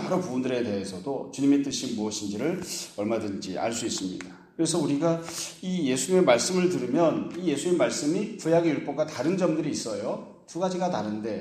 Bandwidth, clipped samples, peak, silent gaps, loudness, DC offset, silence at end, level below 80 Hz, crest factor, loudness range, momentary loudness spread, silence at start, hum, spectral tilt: 15.5 kHz; under 0.1%; -6 dBFS; none; -27 LUFS; under 0.1%; 0 s; -68 dBFS; 20 dB; 5 LU; 9 LU; 0 s; none; -5 dB/octave